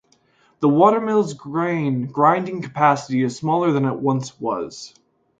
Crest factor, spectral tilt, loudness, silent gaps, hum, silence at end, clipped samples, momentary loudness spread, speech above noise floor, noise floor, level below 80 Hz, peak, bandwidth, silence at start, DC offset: 18 dB; -7 dB/octave; -20 LUFS; none; none; 0.5 s; under 0.1%; 11 LU; 40 dB; -59 dBFS; -64 dBFS; -2 dBFS; 9.2 kHz; 0.6 s; under 0.1%